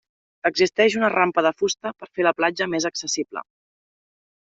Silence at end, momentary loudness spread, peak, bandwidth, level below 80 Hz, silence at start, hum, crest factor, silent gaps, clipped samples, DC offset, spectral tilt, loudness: 1.05 s; 10 LU; -4 dBFS; 8 kHz; -68 dBFS; 0.45 s; none; 20 dB; none; under 0.1%; under 0.1%; -3 dB/octave; -22 LUFS